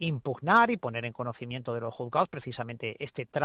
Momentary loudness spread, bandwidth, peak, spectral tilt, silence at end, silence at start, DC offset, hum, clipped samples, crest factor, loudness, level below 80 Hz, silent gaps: 14 LU; 7.6 kHz; -10 dBFS; -8 dB/octave; 0 s; 0 s; under 0.1%; none; under 0.1%; 20 dB; -30 LUFS; -70 dBFS; none